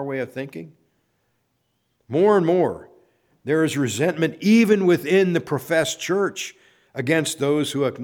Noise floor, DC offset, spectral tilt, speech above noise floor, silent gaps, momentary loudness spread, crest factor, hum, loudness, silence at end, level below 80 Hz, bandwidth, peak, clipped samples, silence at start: -71 dBFS; under 0.1%; -5.5 dB/octave; 50 dB; none; 16 LU; 18 dB; none; -20 LUFS; 0 s; -66 dBFS; 19.5 kHz; -4 dBFS; under 0.1%; 0 s